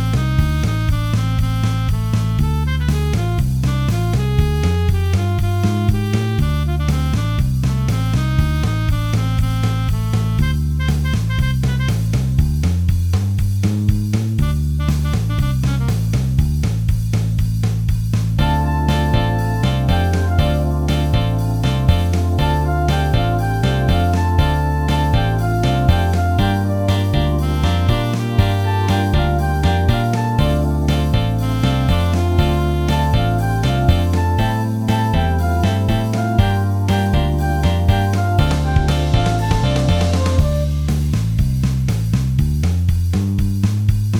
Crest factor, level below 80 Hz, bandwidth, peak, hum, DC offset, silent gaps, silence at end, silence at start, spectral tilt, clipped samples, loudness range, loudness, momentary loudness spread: 16 dB; -22 dBFS; 17 kHz; 0 dBFS; none; under 0.1%; none; 0 s; 0 s; -7 dB/octave; under 0.1%; 2 LU; -17 LUFS; 2 LU